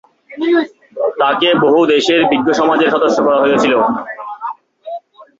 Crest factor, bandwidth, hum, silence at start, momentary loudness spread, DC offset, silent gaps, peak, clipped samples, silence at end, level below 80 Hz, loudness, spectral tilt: 14 dB; 7.8 kHz; none; 0.3 s; 16 LU; under 0.1%; none; 0 dBFS; under 0.1%; 0.15 s; -56 dBFS; -13 LUFS; -4.5 dB/octave